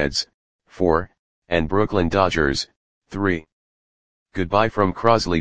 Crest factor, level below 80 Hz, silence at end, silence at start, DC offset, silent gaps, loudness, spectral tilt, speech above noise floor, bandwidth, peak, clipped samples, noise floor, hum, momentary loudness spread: 22 dB; -40 dBFS; 0 s; 0 s; 0.9%; 0.34-0.59 s, 1.19-1.42 s, 2.76-3.02 s, 3.52-4.26 s; -21 LUFS; -5.5 dB/octave; over 70 dB; 9.8 kHz; 0 dBFS; under 0.1%; under -90 dBFS; none; 15 LU